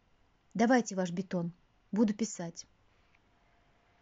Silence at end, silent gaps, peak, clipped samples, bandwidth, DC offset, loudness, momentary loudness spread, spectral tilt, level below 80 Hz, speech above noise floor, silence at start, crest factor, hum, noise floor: 1.4 s; none; -16 dBFS; under 0.1%; 8 kHz; under 0.1%; -33 LUFS; 15 LU; -5.5 dB/octave; -72 dBFS; 38 dB; 0.55 s; 20 dB; none; -69 dBFS